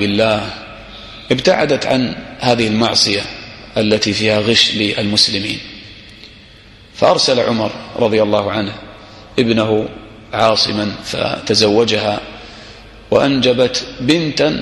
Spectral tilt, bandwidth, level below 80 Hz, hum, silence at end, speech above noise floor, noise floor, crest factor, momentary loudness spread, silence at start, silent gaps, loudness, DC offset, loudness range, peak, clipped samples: -4 dB/octave; 12.5 kHz; -44 dBFS; none; 0 s; 27 dB; -41 dBFS; 16 dB; 20 LU; 0 s; none; -15 LUFS; under 0.1%; 3 LU; 0 dBFS; under 0.1%